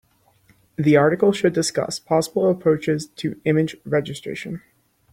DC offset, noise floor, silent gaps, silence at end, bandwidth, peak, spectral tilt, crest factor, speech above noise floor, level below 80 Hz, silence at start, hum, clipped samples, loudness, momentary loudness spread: under 0.1%; -58 dBFS; none; 0.55 s; 16.5 kHz; -2 dBFS; -5.5 dB/octave; 18 dB; 38 dB; -60 dBFS; 0.8 s; none; under 0.1%; -21 LUFS; 14 LU